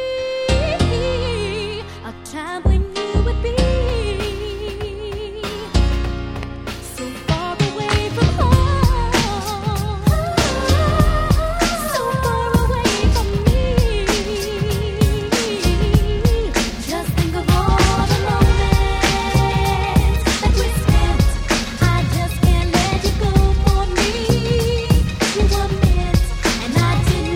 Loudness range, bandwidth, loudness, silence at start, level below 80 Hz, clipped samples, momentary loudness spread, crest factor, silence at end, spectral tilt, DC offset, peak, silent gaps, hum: 5 LU; 16.5 kHz; -18 LUFS; 0 s; -22 dBFS; under 0.1%; 9 LU; 16 dB; 0 s; -5.5 dB/octave; under 0.1%; 0 dBFS; none; none